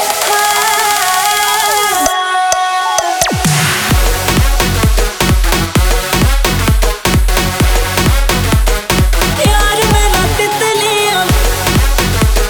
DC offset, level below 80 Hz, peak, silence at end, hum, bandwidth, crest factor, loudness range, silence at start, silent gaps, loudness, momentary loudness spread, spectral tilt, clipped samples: under 0.1%; -16 dBFS; 0 dBFS; 0 s; none; over 20 kHz; 10 dB; 1 LU; 0 s; none; -11 LUFS; 2 LU; -3.5 dB/octave; under 0.1%